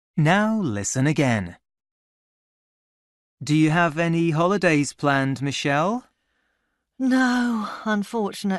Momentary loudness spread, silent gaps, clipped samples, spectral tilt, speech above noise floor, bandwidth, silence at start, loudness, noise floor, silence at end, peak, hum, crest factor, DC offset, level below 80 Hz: 8 LU; 1.91-3.37 s; under 0.1%; -5.5 dB/octave; 53 dB; 12 kHz; 0.15 s; -22 LUFS; -74 dBFS; 0 s; -6 dBFS; none; 18 dB; under 0.1%; -60 dBFS